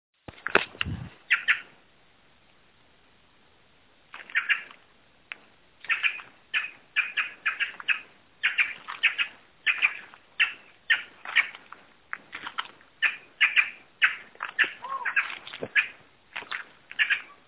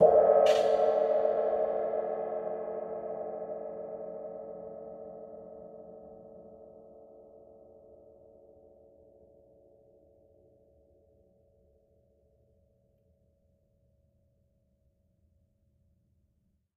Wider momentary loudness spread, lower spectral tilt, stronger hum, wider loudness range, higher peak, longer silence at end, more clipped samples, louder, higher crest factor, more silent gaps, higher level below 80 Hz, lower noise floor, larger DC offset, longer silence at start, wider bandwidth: second, 17 LU vs 27 LU; second, 1 dB/octave vs -5 dB/octave; neither; second, 8 LU vs 27 LU; first, -4 dBFS vs -10 dBFS; second, 0.15 s vs 9.55 s; neither; first, -26 LUFS vs -29 LUFS; about the same, 28 dB vs 24 dB; neither; first, -60 dBFS vs -72 dBFS; second, -61 dBFS vs -74 dBFS; neither; first, 0.35 s vs 0 s; second, 4 kHz vs 9.6 kHz